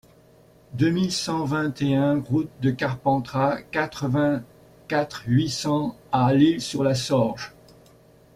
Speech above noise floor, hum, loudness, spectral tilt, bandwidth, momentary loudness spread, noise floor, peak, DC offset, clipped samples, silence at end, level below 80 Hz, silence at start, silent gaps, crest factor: 31 dB; none; -23 LUFS; -6 dB/octave; 15.5 kHz; 6 LU; -54 dBFS; -6 dBFS; under 0.1%; under 0.1%; 0.85 s; -56 dBFS; 0.7 s; none; 18 dB